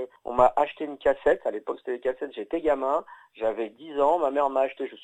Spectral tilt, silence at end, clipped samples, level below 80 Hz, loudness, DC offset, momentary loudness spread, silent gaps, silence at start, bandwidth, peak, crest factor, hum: -6 dB/octave; 0.1 s; under 0.1%; -54 dBFS; -26 LUFS; under 0.1%; 10 LU; none; 0 s; 9.2 kHz; -6 dBFS; 20 dB; none